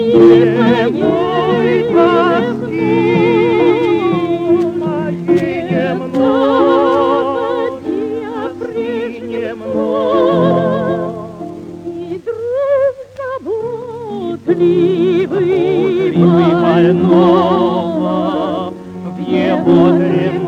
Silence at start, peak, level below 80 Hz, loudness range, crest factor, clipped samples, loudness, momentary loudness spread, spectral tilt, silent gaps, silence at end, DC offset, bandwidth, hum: 0 s; 0 dBFS; -50 dBFS; 6 LU; 12 dB; under 0.1%; -13 LUFS; 13 LU; -8.5 dB/octave; none; 0 s; under 0.1%; 6.8 kHz; none